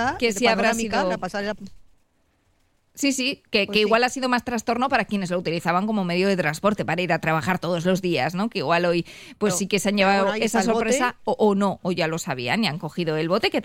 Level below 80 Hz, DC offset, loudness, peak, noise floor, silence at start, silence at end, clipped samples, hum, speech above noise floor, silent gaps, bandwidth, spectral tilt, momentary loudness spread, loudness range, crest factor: -54 dBFS; 0.2%; -22 LUFS; -6 dBFS; -65 dBFS; 0 s; 0 s; under 0.1%; none; 43 dB; none; 16.5 kHz; -4.5 dB/octave; 6 LU; 3 LU; 16 dB